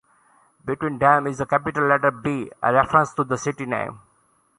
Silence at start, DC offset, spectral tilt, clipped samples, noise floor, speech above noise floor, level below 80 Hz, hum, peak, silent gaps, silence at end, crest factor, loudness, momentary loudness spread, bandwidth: 0.65 s; under 0.1%; -6 dB/octave; under 0.1%; -63 dBFS; 42 dB; -54 dBFS; none; -2 dBFS; none; 0.6 s; 20 dB; -21 LUFS; 10 LU; 11 kHz